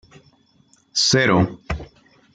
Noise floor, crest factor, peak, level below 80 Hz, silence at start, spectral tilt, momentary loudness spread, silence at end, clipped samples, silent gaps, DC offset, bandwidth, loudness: -58 dBFS; 20 dB; -4 dBFS; -42 dBFS; 0.95 s; -3.5 dB/octave; 16 LU; 0.5 s; under 0.1%; none; under 0.1%; 9.4 kHz; -18 LUFS